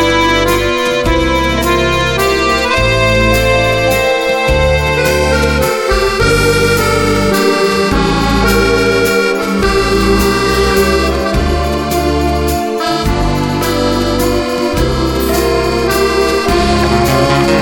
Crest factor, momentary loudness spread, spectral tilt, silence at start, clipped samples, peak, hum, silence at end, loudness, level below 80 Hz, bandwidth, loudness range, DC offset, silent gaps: 12 dB; 4 LU; -4.5 dB/octave; 0 s; under 0.1%; 0 dBFS; none; 0 s; -12 LUFS; -20 dBFS; 17.5 kHz; 3 LU; under 0.1%; none